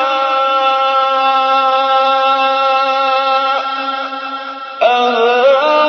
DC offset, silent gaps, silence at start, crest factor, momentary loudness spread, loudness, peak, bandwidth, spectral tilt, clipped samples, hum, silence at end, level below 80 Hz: under 0.1%; none; 0 s; 12 dB; 9 LU; -12 LUFS; 0 dBFS; 6.6 kHz; -1.5 dB/octave; under 0.1%; none; 0 s; -90 dBFS